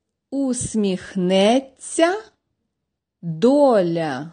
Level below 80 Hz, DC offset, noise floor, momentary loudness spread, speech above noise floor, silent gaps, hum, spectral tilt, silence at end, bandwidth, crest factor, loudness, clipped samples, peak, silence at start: -54 dBFS; under 0.1%; -80 dBFS; 14 LU; 61 dB; none; none; -5 dB/octave; 0 s; 10 kHz; 16 dB; -19 LUFS; under 0.1%; -4 dBFS; 0.3 s